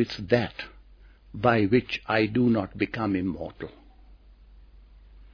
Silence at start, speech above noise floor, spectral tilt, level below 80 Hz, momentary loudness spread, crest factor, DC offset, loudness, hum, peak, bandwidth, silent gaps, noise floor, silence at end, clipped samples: 0 s; 27 dB; -8 dB/octave; -52 dBFS; 18 LU; 22 dB; under 0.1%; -25 LUFS; none; -6 dBFS; 5.4 kHz; none; -52 dBFS; 0.1 s; under 0.1%